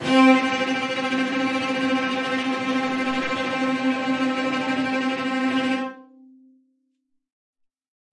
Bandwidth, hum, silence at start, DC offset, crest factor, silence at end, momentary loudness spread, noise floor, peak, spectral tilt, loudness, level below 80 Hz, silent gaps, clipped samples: 11 kHz; none; 0 s; under 0.1%; 18 dB; 2.1 s; 5 LU; -73 dBFS; -4 dBFS; -4 dB/octave; -22 LUFS; -68 dBFS; none; under 0.1%